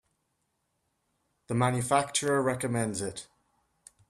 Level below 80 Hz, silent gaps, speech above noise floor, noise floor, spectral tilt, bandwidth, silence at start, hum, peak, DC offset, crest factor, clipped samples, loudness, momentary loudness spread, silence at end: -66 dBFS; none; 50 dB; -78 dBFS; -4.5 dB/octave; 14 kHz; 1.5 s; none; -10 dBFS; under 0.1%; 20 dB; under 0.1%; -29 LUFS; 9 LU; 0.85 s